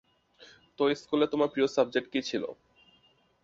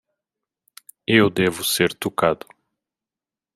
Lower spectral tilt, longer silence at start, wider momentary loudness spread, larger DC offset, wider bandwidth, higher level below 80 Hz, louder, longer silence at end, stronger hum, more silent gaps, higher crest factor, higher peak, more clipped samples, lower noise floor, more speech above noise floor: about the same, -5 dB/octave vs -4 dB/octave; second, 0.4 s vs 1.1 s; about the same, 8 LU vs 9 LU; neither; second, 7.8 kHz vs 15.5 kHz; second, -72 dBFS vs -60 dBFS; second, -29 LUFS vs -20 LUFS; second, 0.9 s vs 1.2 s; neither; neither; about the same, 20 dB vs 22 dB; second, -12 dBFS vs -2 dBFS; neither; second, -66 dBFS vs -90 dBFS; second, 38 dB vs 70 dB